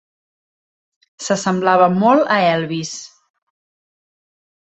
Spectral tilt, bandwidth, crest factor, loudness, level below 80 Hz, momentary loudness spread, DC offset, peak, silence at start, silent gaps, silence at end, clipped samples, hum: -5 dB/octave; 8.2 kHz; 18 dB; -16 LUFS; -64 dBFS; 15 LU; under 0.1%; -2 dBFS; 1.2 s; none; 1.6 s; under 0.1%; none